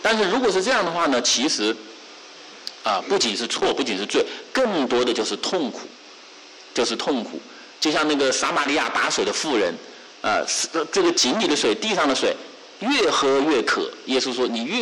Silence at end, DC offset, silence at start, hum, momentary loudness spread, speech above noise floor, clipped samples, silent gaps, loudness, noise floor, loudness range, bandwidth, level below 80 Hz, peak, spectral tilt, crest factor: 0 s; under 0.1%; 0 s; none; 17 LU; 23 dB; under 0.1%; none; -21 LUFS; -44 dBFS; 4 LU; 12 kHz; -60 dBFS; -12 dBFS; -2 dB/octave; 10 dB